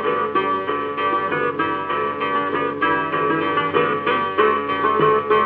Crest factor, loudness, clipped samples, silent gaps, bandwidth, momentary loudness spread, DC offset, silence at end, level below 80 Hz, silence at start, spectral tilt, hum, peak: 16 dB; -20 LUFS; under 0.1%; none; 4.9 kHz; 5 LU; under 0.1%; 0 s; -64 dBFS; 0 s; -8.5 dB/octave; none; -4 dBFS